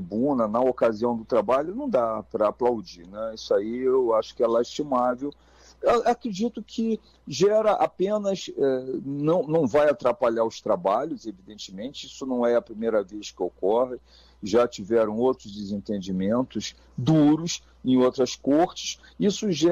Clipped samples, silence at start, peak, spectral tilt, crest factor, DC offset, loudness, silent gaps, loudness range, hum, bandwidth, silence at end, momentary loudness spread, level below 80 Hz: under 0.1%; 0 s; -10 dBFS; -6 dB/octave; 14 dB; under 0.1%; -25 LUFS; none; 3 LU; none; 9.4 kHz; 0 s; 12 LU; -58 dBFS